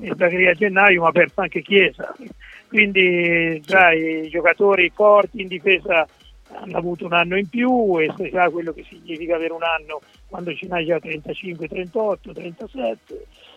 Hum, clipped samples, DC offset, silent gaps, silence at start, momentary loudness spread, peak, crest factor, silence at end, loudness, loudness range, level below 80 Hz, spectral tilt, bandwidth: none; under 0.1%; under 0.1%; none; 0 s; 19 LU; 0 dBFS; 20 dB; 0.35 s; -18 LUFS; 10 LU; -52 dBFS; -6.5 dB/octave; 8 kHz